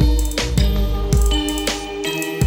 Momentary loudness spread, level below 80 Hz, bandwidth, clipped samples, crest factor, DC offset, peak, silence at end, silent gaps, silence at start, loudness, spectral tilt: 5 LU; -20 dBFS; 17.5 kHz; under 0.1%; 14 dB; under 0.1%; -4 dBFS; 0 s; none; 0 s; -20 LUFS; -4.5 dB/octave